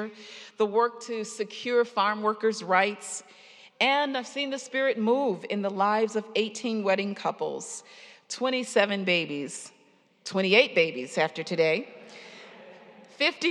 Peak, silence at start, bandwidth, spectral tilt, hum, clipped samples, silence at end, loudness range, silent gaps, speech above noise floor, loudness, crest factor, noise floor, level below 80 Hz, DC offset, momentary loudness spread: -6 dBFS; 0 s; 11.5 kHz; -3.5 dB/octave; none; under 0.1%; 0 s; 3 LU; none; 35 dB; -27 LUFS; 22 dB; -62 dBFS; under -90 dBFS; under 0.1%; 17 LU